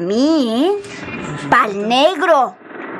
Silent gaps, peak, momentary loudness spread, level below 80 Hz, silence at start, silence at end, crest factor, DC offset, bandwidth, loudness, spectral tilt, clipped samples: none; -2 dBFS; 13 LU; -56 dBFS; 0 s; 0 s; 14 dB; under 0.1%; 13.5 kHz; -15 LUFS; -4.5 dB/octave; under 0.1%